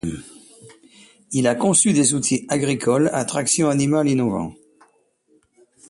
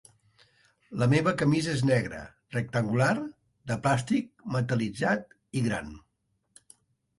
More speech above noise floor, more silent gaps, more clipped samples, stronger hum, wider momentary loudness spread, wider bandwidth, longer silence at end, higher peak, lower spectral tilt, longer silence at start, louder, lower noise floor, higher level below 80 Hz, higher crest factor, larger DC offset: second, 42 dB vs 49 dB; neither; neither; neither; about the same, 11 LU vs 12 LU; about the same, 11.5 kHz vs 11.5 kHz; first, 1.35 s vs 1.2 s; first, -2 dBFS vs -10 dBFS; second, -4.5 dB/octave vs -6.5 dB/octave; second, 0.05 s vs 0.9 s; first, -19 LUFS vs -28 LUFS; second, -61 dBFS vs -76 dBFS; about the same, -54 dBFS vs -58 dBFS; about the same, 18 dB vs 18 dB; neither